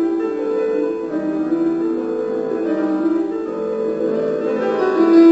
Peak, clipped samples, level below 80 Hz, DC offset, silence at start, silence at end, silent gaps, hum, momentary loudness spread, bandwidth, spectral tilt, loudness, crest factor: -2 dBFS; under 0.1%; -58 dBFS; under 0.1%; 0 s; 0 s; none; none; 5 LU; 7.8 kHz; -7.5 dB/octave; -19 LUFS; 16 dB